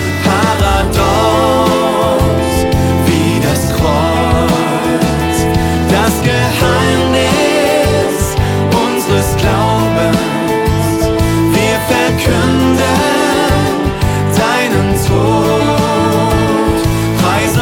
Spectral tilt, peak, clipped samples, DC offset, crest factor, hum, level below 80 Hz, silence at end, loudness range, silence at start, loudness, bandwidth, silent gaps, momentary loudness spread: -5.5 dB/octave; 0 dBFS; under 0.1%; under 0.1%; 12 dB; none; -24 dBFS; 0 s; 1 LU; 0 s; -12 LUFS; 18 kHz; none; 2 LU